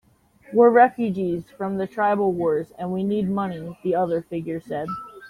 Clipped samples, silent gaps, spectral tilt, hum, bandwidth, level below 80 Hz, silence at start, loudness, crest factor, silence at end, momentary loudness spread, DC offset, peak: under 0.1%; none; -8.5 dB/octave; none; 10 kHz; -60 dBFS; 0.5 s; -22 LUFS; 20 dB; 0 s; 13 LU; under 0.1%; -4 dBFS